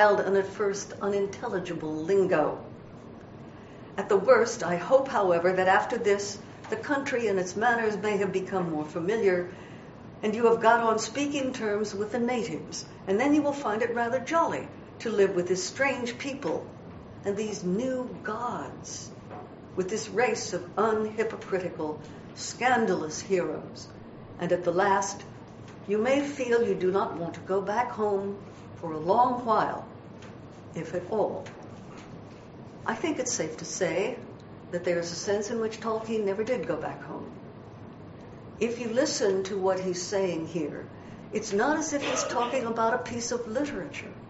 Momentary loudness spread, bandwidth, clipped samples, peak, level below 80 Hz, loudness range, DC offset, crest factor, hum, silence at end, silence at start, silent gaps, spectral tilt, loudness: 20 LU; 8 kHz; under 0.1%; -8 dBFS; -62 dBFS; 6 LU; under 0.1%; 22 dB; none; 0 s; 0 s; none; -4 dB/octave; -28 LUFS